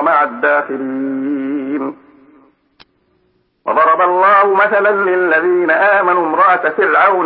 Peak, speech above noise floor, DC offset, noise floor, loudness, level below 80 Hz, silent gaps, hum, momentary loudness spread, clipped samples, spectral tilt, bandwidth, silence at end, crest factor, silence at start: 0 dBFS; 47 dB; under 0.1%; -59 dBFS; -13 LUFS; -68 dBFS; none; none; 10 LU; under 0.1%; -10 dB/octave; 5.4 kHz; 0 s; 12 dB; 0 s